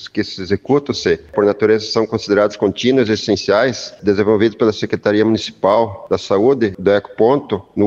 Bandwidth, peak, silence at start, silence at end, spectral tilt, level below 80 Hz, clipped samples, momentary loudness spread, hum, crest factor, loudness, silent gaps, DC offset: 7.6 kHz; -2 dBFS; 0 s; 0 s; -5.5 dB/octave; -50 dBFS; under 0.1%; 5 LU; none; 14 dB; -16 LUFS; none; under 0.1%